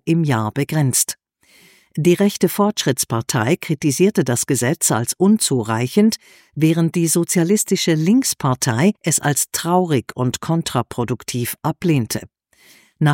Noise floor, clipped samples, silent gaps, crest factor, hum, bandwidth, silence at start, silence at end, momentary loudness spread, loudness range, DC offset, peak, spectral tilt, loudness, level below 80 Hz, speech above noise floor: -53 dBFS; under 0.1%; none; 16 dB; none; 17 kHz; 0.05 s; 0 s; 7 LU; 3 LU; under 0.1%; -2 dBFS; -4.5 dB/octave; -18 LUFS; -58 dBFS; 35 dB